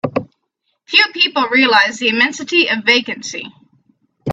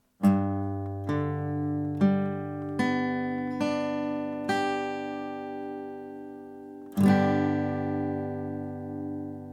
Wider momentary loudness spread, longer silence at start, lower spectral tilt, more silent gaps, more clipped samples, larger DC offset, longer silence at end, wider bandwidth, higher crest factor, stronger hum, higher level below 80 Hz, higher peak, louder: about the same, 15 LU vs 13 LU; second, 0.05 s vs 0.2 s; second, -3 dB/octave vs -7.5 dB/octave; neither; neither; neither; about the same, 0 s vs 0 s; second, 8.8 kHz vs 13.5 kHz; about the same, 16 dB vs 18 dB; neither; first, -62 dBFS vs -70 dBFS; first, 0 dBFS vs -10 dBFS; first, -13 LUFS vs -29 LUFS